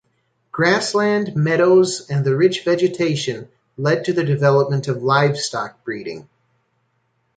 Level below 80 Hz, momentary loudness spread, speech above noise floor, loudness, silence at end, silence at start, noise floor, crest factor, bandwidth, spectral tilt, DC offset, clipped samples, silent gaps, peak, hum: -62 dBFS; 13 LU; 49 dB; -18 LUFS; 1.15 s; 0.55 s; -67 dBFS; 16 dB; 9.4 kHz; -5.5 dB/octave; under 0.1%; under 0.1%; none; -2 dBFS; none